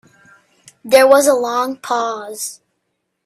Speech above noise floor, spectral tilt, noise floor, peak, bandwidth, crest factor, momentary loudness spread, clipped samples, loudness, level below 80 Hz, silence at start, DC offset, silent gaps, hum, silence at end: 57 dB; -1.5 dB/octave; -72 dBFS; 0 dBFS; 15.5 kHz; 16 dB; 16 LU; under 0.1%; -15 LUFS; -64 dBFS; 0.85 s; under 0.1%; none; none; 0.7 s